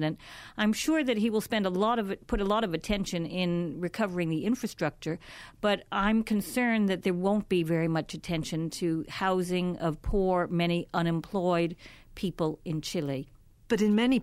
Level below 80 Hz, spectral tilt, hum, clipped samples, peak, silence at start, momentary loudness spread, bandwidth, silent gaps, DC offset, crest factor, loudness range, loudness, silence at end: -48 dBFS; -6 dB/octave; none; under 0.1%; -14 dBFS; 0 s; 8 LU; 16 kHz; none; under 0.1%; 14 dB; 2 LU; -29 LUFS; 0 s